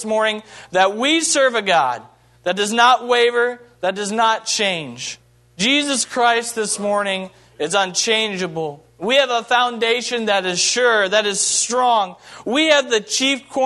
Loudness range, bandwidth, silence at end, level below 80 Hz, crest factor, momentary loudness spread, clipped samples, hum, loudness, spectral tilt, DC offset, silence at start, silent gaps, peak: 3 LU; 12.5 kHz; 0 s; -66 dBFS; 18 dB; 12 LU; under 0.1%; none; -17 LUFS; -1.5 dB/octave; under 0.1%; 0 s; none; 0 dBFS